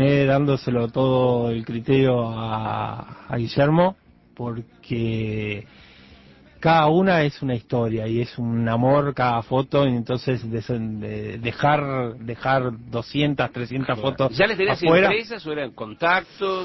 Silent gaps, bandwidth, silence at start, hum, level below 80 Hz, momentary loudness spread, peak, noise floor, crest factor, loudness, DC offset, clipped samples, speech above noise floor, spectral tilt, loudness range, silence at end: none; 6 kHz; 0 s; none; -50 dBFS; 12 LU; -6 dBFS; -49 dBFS; 16 dB; -22 LUFS; under 0.1%; under 0.1%; 27 dB; -8 dB/octave; 4 LU; 0 s